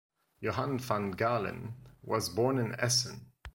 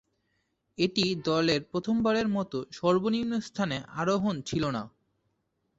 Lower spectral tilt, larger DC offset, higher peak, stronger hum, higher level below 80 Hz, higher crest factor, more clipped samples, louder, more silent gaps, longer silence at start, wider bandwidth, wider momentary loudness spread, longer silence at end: second, -4 dB/octave vs -5.5 dB/octave; neither; about the same, -14 dBFS vs -12 dBFS; neither; about the same, -60 dBFS vs -60 dBFS; about the same, 20 dB vs 18 dB; neither; second, -32 LUFS vs -29 LUFS; neither; second, 0.4 s vs 0.8 s; first, 16.5 kHz vs 8 kHz; first, 15 LU vs 6 LU; second, 0.05 s vs 0.9 s